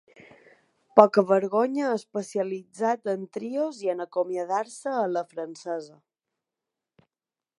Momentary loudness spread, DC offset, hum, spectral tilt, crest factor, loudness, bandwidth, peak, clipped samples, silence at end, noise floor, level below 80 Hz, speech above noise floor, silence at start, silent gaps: 14 LU; under 0.1%; none; -6 dB/octave; 26 dB; -26 LUFS; 11.5 kHz; 0 dBFS; under 0.1%; 1.7 s; under -90 dBFS; -78 dBFS; over 65 dB; 0.95 s; none